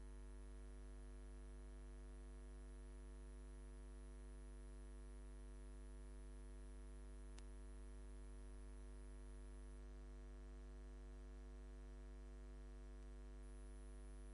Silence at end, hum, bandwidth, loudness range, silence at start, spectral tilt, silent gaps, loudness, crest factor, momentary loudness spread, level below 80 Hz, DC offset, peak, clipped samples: 0 s; 50 Hz at -55 dBFS; 10.5 kHz; 0 LU; 0 s; -6 dB/octave; none; -60 LUFS; 18 dB; 0 LU; -56 dBFS; under 0.1%; -38 dBFS; under 0.1%